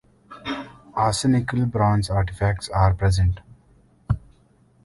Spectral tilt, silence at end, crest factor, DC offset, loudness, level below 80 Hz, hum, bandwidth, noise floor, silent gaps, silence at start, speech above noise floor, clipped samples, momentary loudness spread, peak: -6 dB/octave; 0.65 s; 16 dB; under 0.1%; -23 LUFS; -34 dBFS; none; 11.5 kHz; -57 dBFS; none; 0.3 s; 37 dB; under 0.1%; 12 LU; -8 dBFS